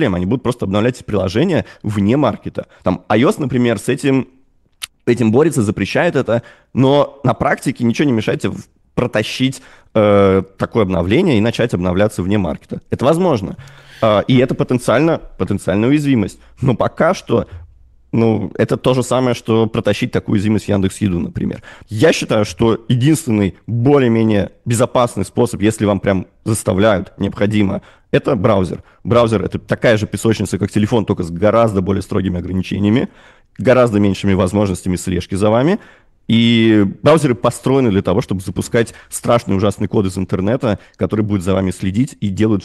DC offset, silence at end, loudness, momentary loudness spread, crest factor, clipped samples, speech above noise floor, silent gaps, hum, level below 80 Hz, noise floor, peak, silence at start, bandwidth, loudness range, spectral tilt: under 0.1%; 0 s; -16 LUFS; 8 LU; 14 dB; under 0.1%; 21 dB; none; none; -42 dBFS; -36 dBFS; -2 dBFS; 0 s; 12.5 kHz; 2 LU; -6.5 dB/octave